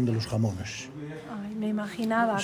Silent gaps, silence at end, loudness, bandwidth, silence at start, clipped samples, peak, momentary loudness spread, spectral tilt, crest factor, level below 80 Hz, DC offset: none; 0 s; -31 LUFS; 16 kHz; 0 s; under 0.1%; -14 dBFS; 12 LU; -6 dB/octave; 16 dB; -54 dBFS; under 0.1%